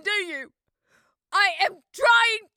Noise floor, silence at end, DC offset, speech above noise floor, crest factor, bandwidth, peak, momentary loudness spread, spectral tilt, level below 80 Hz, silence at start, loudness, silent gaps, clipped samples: -66 dBFS; 0.15 s; under 0.1%; 43 dB; 18 dB; 18.5 kHz; -6 dBFS; 12 LU; 1 dB/octave; -74 dBFS; 0.05 s; -21 LUFS; none; under 0.1%